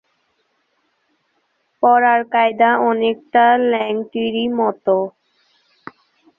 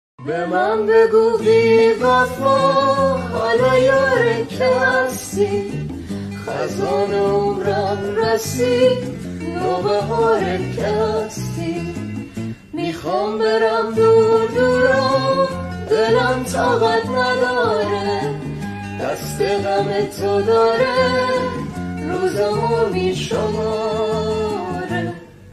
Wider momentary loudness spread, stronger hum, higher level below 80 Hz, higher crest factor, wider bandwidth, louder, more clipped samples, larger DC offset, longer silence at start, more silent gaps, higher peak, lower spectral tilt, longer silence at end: second, 7 LU vs 12 LU; neither; second, -66 dBFS vs -44 dBFS; about the same, 16 dB vs 14 dB; second, 4.2 kHz vs 13.5 kHz; about the same, -16 LUFS vs -18 LUFS; neither; neither; first, 1.8 s vs 0.2 s; neither; about the same, -2 dBFS vs -2 dBFS; first, -7.5 dB/octave vs -5.5 dB/octave; first, 1.3 s vs 0 s